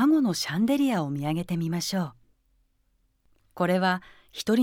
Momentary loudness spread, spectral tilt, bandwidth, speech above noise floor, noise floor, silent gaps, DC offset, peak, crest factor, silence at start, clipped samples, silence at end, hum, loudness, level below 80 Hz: 9 LU; -5.5 dB/octave; 17.5 kHz; 44 dB; -69 dBFS; none; under 0.1%; -10 dBFS; 16 dB; 0 s; under 0.1%; 0 s; none; -27 LUFS; -64 dBFS